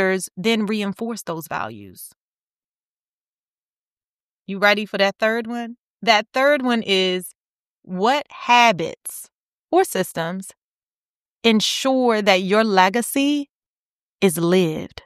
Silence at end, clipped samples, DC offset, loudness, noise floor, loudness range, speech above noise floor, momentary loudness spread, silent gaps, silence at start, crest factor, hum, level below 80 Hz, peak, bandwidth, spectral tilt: 0.2 s; under 0.1%; under 0.1%; -19 LUFS; under -90 dBFS; 9 LU; over 70 dB; 16 LU; 2.16-3.97 s, 4.03-4.45 s, 5.78-5.98 s, 7.35-7.82 s, 9.32-9.68 s, 10.57-11.37 s, 13.49-14.19 s; 0 s; 20 dB; none; -66 dBFS; -2 dBFS; 15 kHz; -4 dB/octave